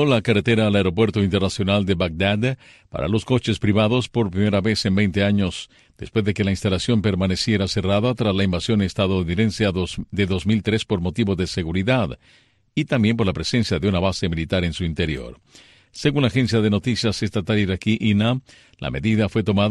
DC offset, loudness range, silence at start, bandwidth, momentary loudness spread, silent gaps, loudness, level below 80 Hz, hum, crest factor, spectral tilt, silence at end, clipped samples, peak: under 0.1%; 2 LU; 0 s; 11.5 kHz; 7 LU; none; -21 LUFS; -42 dBFS; none; 16 dB; -6 dB/octave; 0 s; under 0.1%; -4 dBFS